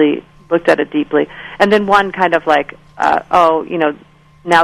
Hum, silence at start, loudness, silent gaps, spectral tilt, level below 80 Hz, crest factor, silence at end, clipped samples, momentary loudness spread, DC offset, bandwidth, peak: none; 0 s; -14 LUFS; none; -5.5 dB/octave; -48 dBFS; 14 dB; 0 s; 0.1%; 11 LU; under 0.1%; 13 kHz; 0 dBFS